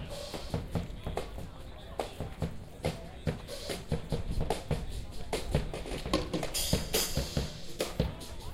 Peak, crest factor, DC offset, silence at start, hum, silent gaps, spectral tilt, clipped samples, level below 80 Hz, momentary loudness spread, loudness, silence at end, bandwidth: -12 dBFS; 22 dB; under 0.1%; 0 s; none; none; -4.5 dB/octave; under 0.1%; -42 dBFS; 10 LU; -36 LUFS; 0 s; 16 kHz